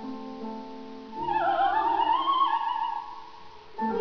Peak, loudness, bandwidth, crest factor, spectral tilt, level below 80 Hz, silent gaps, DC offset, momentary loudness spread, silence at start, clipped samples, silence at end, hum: -14 dBFS; -27 LUFS; 5.4 kHz; 14 dB; -5.5 dB/octave; -62 dBFS; none; 0.4%; 19 LU; 0 s; under 0.1%; 0 s; none